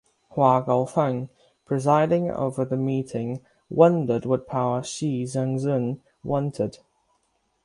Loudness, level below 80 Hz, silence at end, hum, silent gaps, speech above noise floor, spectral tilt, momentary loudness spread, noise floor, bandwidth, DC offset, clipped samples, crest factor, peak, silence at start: -24 LUFS; -60 dBFS; 0.9 s; none; none; 47 dB; -7.5 dB/octave; 12 LU; -70 dBFS; 11.5 kHz; under 0.1%; under 0.1%; 22 dB; -4 dBFS; 0.35 s